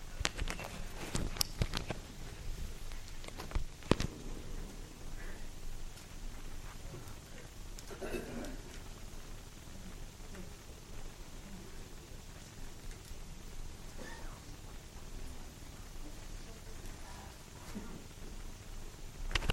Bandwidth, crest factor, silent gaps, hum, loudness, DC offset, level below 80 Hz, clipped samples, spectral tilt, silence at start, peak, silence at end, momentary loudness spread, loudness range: 16 kHz; 34 dB; none; none; -45 LUFS; under 0.1%; -46 dBFS; under 0.1%; -4 dB/octave; 0 s; -8 dBFS; 0 s; 13 LU; 10 LU